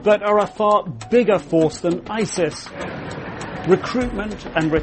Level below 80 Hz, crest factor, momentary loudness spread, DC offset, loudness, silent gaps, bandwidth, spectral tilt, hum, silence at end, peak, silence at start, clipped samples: -44 dBFS; 18 dB; 13 LU; under 0.1%; -20 LUFS; none; 8.8 kHz; -5.5 dB/octave; none; 0 s; -2 dBFS; 0 s; under 0.1%